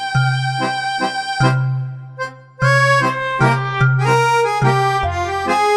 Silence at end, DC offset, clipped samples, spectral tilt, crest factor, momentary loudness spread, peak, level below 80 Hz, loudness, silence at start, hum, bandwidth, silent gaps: 0 s; under 0.1%; under 0.1%; -5.5 dB/octave; 16 dB; 10 LU; -2 dBFS; -42 dBFS; -16 LUFS; 0 s; none; 12 kHz; none